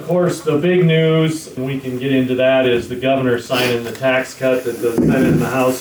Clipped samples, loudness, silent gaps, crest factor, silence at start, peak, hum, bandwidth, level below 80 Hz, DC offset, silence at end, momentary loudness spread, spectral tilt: under 0.1%; -16 LUFS; none; 10 dB; 0 s; -6 dBFS; none; over 20 kHz; -46 dBFS; under 0.1%; 0 s; 6 LU; -6 dB/octave